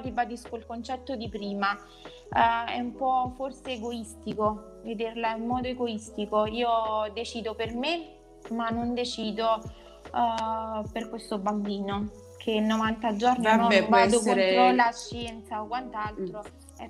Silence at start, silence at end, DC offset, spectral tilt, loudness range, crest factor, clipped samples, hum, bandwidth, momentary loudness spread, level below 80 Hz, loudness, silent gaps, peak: 0 s; 0 s; under 0.1%; -4.5 dB/octave; 8 LU; 22 dB; under 0.1%; none; 12.5 kHz; 16 LU; -52 dBFS; -28 LUFS; none; -6 dBFS